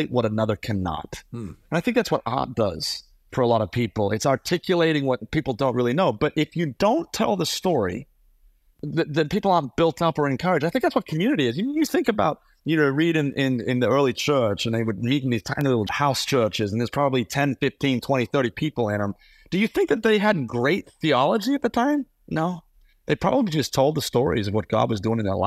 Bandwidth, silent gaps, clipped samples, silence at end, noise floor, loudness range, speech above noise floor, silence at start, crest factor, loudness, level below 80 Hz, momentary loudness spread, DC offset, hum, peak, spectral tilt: 15.5 kHz; none; under 0.1%; 0 s; -58 dBFS; 2 LU; 35 dB; 0 s; 18 dB; -23 LUFS; -52 dBFS; 7 LU; under 0.1%; none; -6 dBFS; -5.5 dB/octave